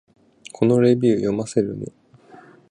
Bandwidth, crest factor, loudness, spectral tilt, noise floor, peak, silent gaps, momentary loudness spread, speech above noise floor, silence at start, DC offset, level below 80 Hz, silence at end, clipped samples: 10.5 kHz; 18 dB; -19 LUFS; -7.5 dB/octave; -48 dBFS; -4 dBFS; none; 19 LU; 29 dB; 0.6 s; under 0.1%; -58 dBFS; 0.8 s; under 0.1%